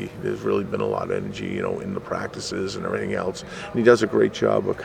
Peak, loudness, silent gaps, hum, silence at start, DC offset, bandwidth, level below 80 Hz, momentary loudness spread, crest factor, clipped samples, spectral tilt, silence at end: -2 dBFS; -24 LUFS; none; none; 0 s; under 0.1%; 12 kHz; -54 dBFS; 12 LU; 20 dB; under 0.1%; -5.5 dB/octave; 0 s